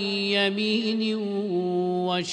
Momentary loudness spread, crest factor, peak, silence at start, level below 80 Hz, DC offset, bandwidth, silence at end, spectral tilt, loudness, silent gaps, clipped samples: 4 LU; 16 dB; -10 dBFS; 0 s; -72 dBFS; under 0.1%; 10 kHz; 0 s; -5 dB/octave; -25 LUFS; none; under 0.1%